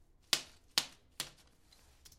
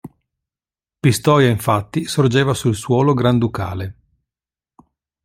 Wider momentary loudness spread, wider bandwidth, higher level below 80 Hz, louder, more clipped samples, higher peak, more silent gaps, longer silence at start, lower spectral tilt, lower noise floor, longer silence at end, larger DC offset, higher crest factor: about the same, 10 LU vs 10 LU; about the same, 16.5 kHz vs 16 kHz; second, -68 dBFS vs -50 dBFS; second, -37 LUFS vs -17 LUFS; neither; second, -8 dBFS vs -2 dBFS; neither; first, 0.35 s vs 0.05 s; second, 0.5 dB/octave vs -6 dB/octave; second, -65 dBFS vs under -90 dBFS; second, 0.1 s vs 1.35 s; neither; first, 36 dB vs 16 dB